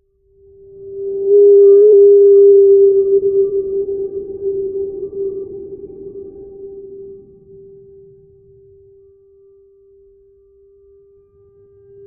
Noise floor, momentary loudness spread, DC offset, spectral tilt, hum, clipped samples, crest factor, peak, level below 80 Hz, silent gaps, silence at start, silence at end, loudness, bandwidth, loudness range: -51 dBFS; 26 LU; under 0.1%; -11 dB/octave; none; under 0.1%; 12 dB; -2 dBFS; -54 dBFS; none; 0.8 s; 4.9 s; -11 LUFS; 1.3 kHz; 21 LU